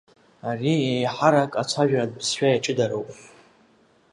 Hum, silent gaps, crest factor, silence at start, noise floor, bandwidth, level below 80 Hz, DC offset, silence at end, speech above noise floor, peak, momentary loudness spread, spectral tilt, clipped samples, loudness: none; none; 22 dB; 0.45 s; -59 dBFS; 11.5 kHz; -68 dBFS; under 0.1%; 0.9 s; 37 dB; -2 dBFS; 12 LU; -5 dB/octave; under 0.1%; -23 LUFS